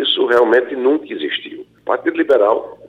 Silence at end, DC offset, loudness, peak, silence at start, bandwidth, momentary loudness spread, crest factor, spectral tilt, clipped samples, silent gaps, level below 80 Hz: 0 s; under 0.1%; -16 LUFS; -2 dBFS; 0 s; 7.6 kHz; 11 LU; 14 dB; -4.5 dB/octave; under 0.1%; none; -62 dBFS